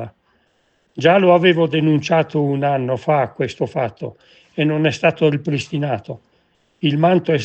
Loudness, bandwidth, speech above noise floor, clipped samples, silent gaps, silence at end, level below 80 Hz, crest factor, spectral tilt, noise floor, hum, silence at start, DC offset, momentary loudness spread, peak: -17 LUFS; 8.4 kHz; 46 dB; under 0.1%; none; 0 s; -62 dBFS; 18 dB; -7 dB/octave; -63 dBFS; none; 0 s; under 0.1%; 18 LU; 0 dBFS